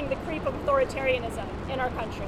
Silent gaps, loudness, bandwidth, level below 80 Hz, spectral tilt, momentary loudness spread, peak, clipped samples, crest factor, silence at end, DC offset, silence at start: none; -28 LUFS; 14 kHz; -42 dBFS; -6 dB/octave; 8 LU; -12 dBFS; under 0.1%; 16 dB; 0 s; under 0.1%; 0 s